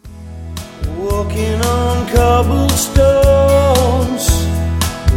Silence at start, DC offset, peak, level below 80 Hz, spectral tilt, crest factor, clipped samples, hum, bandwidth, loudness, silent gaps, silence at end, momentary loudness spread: 0.05 s; under 0.1%; 0 dBFS; -20 dBFS; -5.5 dB/octave; 12 dB; under 0.1%; none; 17 kHz; -13 LUFS; none; 0 s; 15 LU